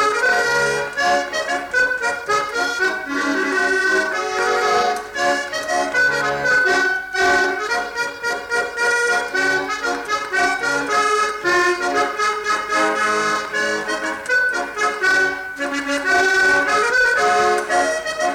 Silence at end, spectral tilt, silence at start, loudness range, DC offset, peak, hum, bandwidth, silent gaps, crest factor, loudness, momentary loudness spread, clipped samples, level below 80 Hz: 0 s; -2 dB/octave; 0 s; 2 LU; under 0.1%; -6 dBFS; none; 17.5 kHz; none; 12 dB; -18 LUFS; 6 LU; under 0.1%; -52 dBFS